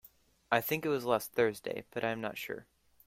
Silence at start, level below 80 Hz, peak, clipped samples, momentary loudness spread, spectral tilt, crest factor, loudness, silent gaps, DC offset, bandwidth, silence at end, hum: 0.5 s; -72 dBFS; -12 dBFS; under 0.1%; 10 LU; -4.5 dB/octave; 24 dB; -34 LUFS; none; under 0.1%; 16.5 kHz; 0.45 s; none